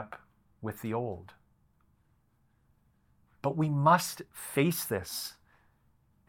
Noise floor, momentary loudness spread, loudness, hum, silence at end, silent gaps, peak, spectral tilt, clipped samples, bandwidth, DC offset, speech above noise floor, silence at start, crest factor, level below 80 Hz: -70 dBFS; 18 LU; -31 LUFS; none; 0.95 s; none; -10 dBFS; -5 dB/octave; under 0.1%; 17.5 kHz; under 0.1%; 39 dB; 0 s; 24 dB; -70 dBFS